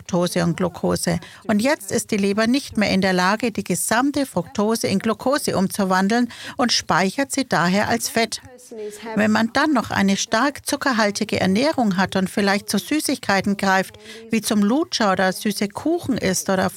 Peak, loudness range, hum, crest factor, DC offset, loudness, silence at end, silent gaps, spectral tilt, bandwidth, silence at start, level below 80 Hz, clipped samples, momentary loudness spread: -2 dBFS; 1 LU; none; 18 dB; under 0.1%; -20 LUFS; 0 s; none; -4.5 dB/octave; 17 kHz; 0 s; -54 dBFS; under 0.1%; 5 LU